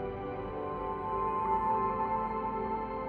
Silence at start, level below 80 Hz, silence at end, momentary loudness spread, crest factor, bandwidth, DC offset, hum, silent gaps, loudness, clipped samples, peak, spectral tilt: 0 s; -52 dBFS; 0 s; 8 LU; 14 dB; 4.9 kHz; under 0.1%; none; none; -33 LUFS; under 0.1%; -20 dBFS; -9 dB/octave